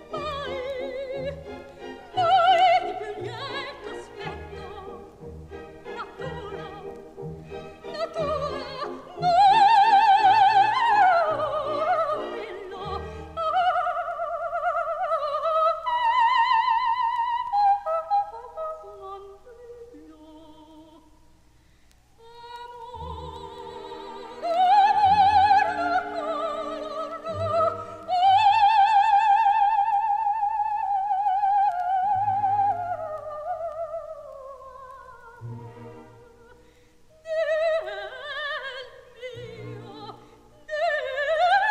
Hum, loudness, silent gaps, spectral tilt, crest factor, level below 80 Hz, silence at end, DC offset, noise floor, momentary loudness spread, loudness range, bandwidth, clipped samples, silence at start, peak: none; -23 LUFS; none; -4.5 dB/octave; 16 dB; -54 dBFS; 0 s; under 0.1%; -57 dBFS; 22 LU; 18 LU; 9.6 kHz; under 0.1%; 0 s; -8 dBFS